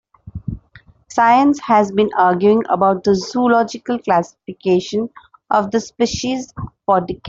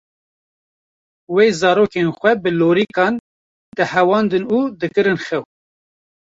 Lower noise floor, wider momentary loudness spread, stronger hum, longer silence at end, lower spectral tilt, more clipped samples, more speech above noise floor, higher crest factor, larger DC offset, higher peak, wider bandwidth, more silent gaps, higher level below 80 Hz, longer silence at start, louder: second, -48 dBFS vs under -90 dBFS; first, 16 LU vs 7 LU; neither; second, 0 s vs 0.9 s; about the same, -5.5 dB/octave vs -6 dB/octave; neither; second, 32 dB vs over 74 dB; about the same, 14 dB vs 16 dB; neither; about the same, -2 dBFS vs -2 dBFS; about the same, 7.8 kHz vs 7.8 kHz; second, none vs 3.20-3.72 s; first, -46 dBFS vs -58 dBFS; second, 0.25 s vs 1.3 s; about the same, -16 LUFS vs -17 LUFS